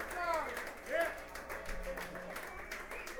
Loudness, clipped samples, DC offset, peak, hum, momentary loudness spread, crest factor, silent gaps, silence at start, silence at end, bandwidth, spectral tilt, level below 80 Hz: -41 LUFS; under 0.1%; under 0.1%; -22 dBFS; none; 8 LU; 18 dB; none; 0 s; 0 s; over 20 kHz; -3 dB/octave; -54 dBFS